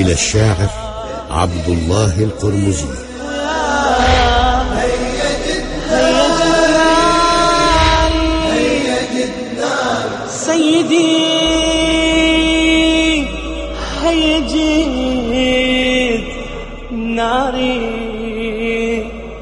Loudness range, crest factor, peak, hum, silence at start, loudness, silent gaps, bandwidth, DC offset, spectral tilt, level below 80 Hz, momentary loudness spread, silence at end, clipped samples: 5 LU; 14 dB; 0 dBFS; none; 0 s; -14 LUFS; none; 10.5 kHz; under 0.1%; -4.5 dB/octave; -26 dBFS; 11 LU; 0 s; under 0.1%